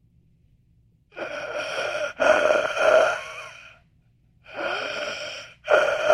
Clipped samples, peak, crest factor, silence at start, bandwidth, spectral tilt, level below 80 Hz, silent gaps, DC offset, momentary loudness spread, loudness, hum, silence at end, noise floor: under 0.1%; -4 dBFS; 20 dB; 1.15 s; 11 kHz; -2 dB/octave; -60 dBFS; none; under 0.1%; 19 LU; -23 LUFS; none; 0 s; -61 dBFS